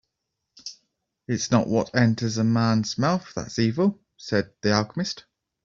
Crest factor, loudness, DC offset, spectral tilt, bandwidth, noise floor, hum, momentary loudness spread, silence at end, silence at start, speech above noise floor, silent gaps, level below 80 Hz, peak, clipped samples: 20 dB; -24 LUFS; under 0.1%; -5.5 dB/octave; 7.6 kHz; -81 dBFS; none; 17 LU; 0.45 s; 0.65 s; 58 dB; none; -58 dBFS; -6 dBFS; under 0.1%